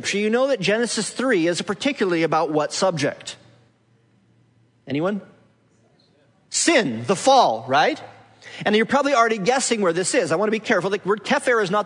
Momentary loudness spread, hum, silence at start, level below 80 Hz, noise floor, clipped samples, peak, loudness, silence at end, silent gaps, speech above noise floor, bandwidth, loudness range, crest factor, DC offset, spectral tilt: 8 LU; none; 0 s; -70 dBFS; -60 dBFS; under 0.1%; -4 dBFS; -20 LUFS; 0 s; none; 40 dB; 11 kHz; 9 LU; 18 dB; under 0.1%; -3.5 dB/octave